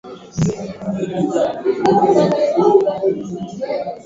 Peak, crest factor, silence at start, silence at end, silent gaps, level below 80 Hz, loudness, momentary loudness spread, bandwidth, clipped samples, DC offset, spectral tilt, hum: 0 dBFS; 16 dB; 0.05 s; 0.05 s; none; -50 dBFS; -17 LUFS; 12 LU; 7.8 kHz; under 0.1%; under 0.1%; -7 dB/octave; none